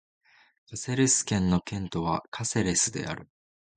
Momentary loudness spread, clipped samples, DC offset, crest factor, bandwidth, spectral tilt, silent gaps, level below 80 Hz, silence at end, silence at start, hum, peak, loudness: 14 LU; under 0.1%; under 0.1%; 18 dB; 9.6 kHz; -4 dB/octave; 2.28-2.32 s; -50 dBFS; 0.55 s; 0.7 s; none; -10 dBFS; -27 LUFS